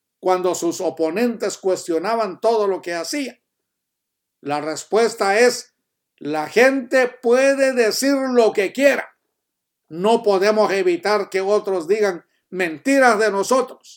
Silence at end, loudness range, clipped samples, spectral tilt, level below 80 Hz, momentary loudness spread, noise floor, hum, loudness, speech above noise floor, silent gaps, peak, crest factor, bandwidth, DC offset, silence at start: 0.05 s; 5 LU; under 0.1%; -3.5 dB/octave; -80 dBFS; 10 LU; -79 dBFS; none; -19 LUFS; 61 dB; none; 0 dBFS; 20 dB; 18 kHz; under 0.1%; 0.25 s